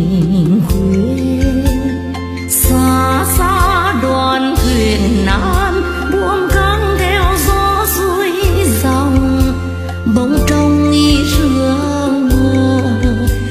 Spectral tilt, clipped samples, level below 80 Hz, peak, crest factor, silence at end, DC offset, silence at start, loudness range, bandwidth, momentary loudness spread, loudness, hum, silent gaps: -5.5 dB/octave; under 0.1%; -20 dBFS; 0 dBFS; 12 dB; 0 s; under 0.1%; 0 s; 1 LU; 15 kHz; 4 LU; -13 LUFS; none; none